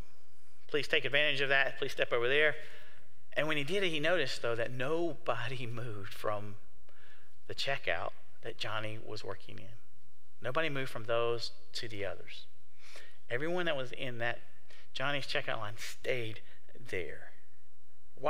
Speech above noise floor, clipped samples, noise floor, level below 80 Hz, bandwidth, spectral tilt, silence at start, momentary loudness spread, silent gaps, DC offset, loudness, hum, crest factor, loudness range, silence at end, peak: 34 dB; under 0.1%; -69 dBFS; -68 dBFS; 16 kHz; -4.5 dB/octave; 0.7 s; 19 LU; none; 3%; -35 LUFS; none; 24 dB; 8 LU; 0 s; -12 dBFS